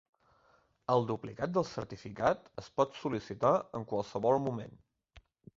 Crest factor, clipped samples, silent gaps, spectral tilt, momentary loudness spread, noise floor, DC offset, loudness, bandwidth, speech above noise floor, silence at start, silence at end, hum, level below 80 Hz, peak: 22 dB; under 0.1%; none; -7 dB/octave; 12 LU; -69 dBFS; under 0.1%; -34 LUFS; 7.6 kHz; 36 dB; 0.9 s; 0.4 s; none; -64 dBFS; -14 dBFS